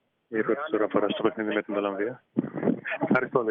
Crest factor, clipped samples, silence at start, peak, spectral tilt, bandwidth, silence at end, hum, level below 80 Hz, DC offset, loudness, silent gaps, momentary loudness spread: 20 dB; under 0.1%; 0.3 s; -8 dBFS; -4.5 dB/octave; 4.7 kHz; 0 s; none; -72 dBFS; under 0.1%; -28 LUFS; none; 7 LU